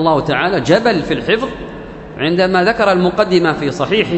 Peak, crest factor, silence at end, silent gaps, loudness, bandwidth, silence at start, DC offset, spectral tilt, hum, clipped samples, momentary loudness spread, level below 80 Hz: 0 dBFS; 14 dB; 0 s; none; -14 LUFS; 8.4 kHz; 0 s; under 0.1%; -6 dB/octave; none; under 0.1%; 13 LU; -40 dBFS